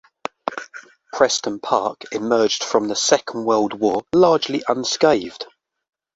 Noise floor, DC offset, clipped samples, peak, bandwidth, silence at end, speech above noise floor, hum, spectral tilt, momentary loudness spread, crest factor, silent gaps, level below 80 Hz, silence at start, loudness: -42 dBFS; under 0.1%; under 0.1%; 0 dBFS; 8 kHz; 0.7 s; 24 dB; none; -3 dB/octave; 17 LU; 20 dB; none; -60 dBFS; 0.45 s; -19 LUFS